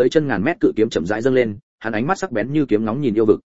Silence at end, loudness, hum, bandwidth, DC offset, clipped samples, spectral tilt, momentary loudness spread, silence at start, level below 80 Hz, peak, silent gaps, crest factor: 0.1 s; -19 LUFS; none; 8 kHz; 1%; under 0.1%; -6.5 dB/octave; 6 LU; 0 s; -50 dBFS; -2 dBFS; 1.63-1.78 s; 16 dB